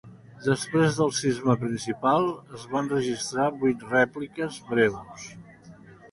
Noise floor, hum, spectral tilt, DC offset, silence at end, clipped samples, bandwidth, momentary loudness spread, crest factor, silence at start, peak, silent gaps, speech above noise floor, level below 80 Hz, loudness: -49 dBFS; none; -5 dB/octave; under 0.1%; 0.05 s; under 0.1%; 11.5 kHz; 10 LU; 18 dB; 0.05 s; -8 dBFS; none; 23 dB; -60 dBFS; -26 LUFS